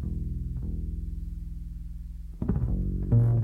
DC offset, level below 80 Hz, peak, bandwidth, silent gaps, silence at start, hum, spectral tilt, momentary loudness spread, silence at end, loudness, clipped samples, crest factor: under 0.1%; -34 dBFS; -12 dBFS; 2 kHz; none; 0 s; none; -11.5 dB/octave; 16 LU; 0 s; -31 LUFS; under 0.1%; 16 dB